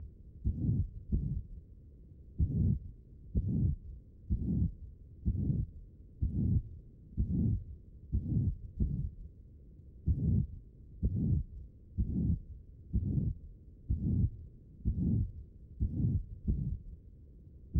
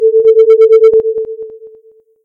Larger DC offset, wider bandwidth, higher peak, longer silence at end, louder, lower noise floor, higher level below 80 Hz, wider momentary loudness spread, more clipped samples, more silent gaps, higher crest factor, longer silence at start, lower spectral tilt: neither; second, 0.9 kHz vs 4.2 kHz; second, -18 dBFS vs 0 dBFS; second, 0 s vs 0.55 s; second, -36 LUFS vs -8 LUFS; first, -54 dBFS vs -44 dBFS; first, -40 dBFS vs -56 dBFS; first, 22 LU vs 19 LU; neither; neither; first, 16 dB vs 8 dB; about the same, 0 s vs 0 s; first, -14 dB/octave vs -5.5 dB/octave